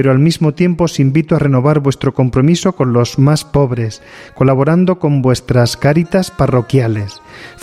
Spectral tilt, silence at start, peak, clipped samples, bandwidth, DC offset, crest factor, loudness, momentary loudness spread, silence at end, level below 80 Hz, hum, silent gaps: -7 dB/octave; 0 s; 0 dBFS; under 0.1%; 14 kHz; under 0.1%; 12 dB; -13 LUFS; 5 LU; 0.1 s; -38 dBFS; none; none